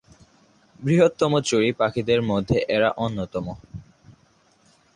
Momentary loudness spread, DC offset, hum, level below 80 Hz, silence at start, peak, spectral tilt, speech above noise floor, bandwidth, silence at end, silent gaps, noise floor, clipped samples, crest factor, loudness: 15 LU; under 0.1%; none; -50 dBFS; 0.8 s; -6 dBFS; -5.5 dB/octave; 39 dB; 11 kHz; 0.85 s; none; -60 dBFS; under 0.1%; 18 dB; -22 LUFS